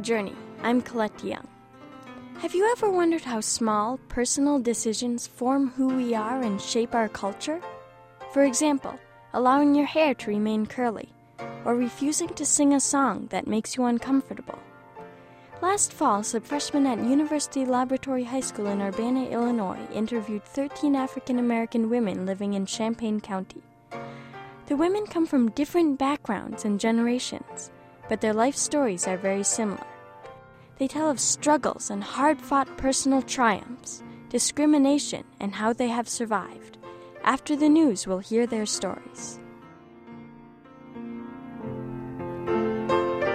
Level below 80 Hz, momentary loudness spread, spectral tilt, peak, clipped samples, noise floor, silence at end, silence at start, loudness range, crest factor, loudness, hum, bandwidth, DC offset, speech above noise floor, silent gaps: -58 dBFS; 18 LU; -3.5 dB/octave; -6 dBFS; under 0.1%; -48 dBFS; 0 s; 0 s; 4 LU; 20 dB; -25 LUFS; none; 15.5 kHz; under 0.1%; 23 dB; none